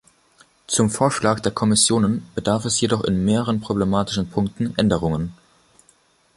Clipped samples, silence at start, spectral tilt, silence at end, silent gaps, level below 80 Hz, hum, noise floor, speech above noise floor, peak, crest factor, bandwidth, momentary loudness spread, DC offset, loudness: under 0.1%; 0.7 s; -4.5 dB/octave; 1.05 s; none; -44 dBFS; none; -59 dBFS; 39 dB; -2 dBFS; 20 dB; 11.5 kHz; 7 LU; under 0.1%; -20 LUFS